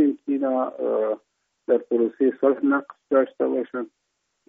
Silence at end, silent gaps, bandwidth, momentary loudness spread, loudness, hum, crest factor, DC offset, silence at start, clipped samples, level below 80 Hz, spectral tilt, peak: 0.6 s; none; 3.7 kHz; 11 LU; -23 LUFS; none; 18 dB; under 0.1%; 0 s; under 0.1%; -80 dBFS; -5.5 dB/octave; -6 dBFS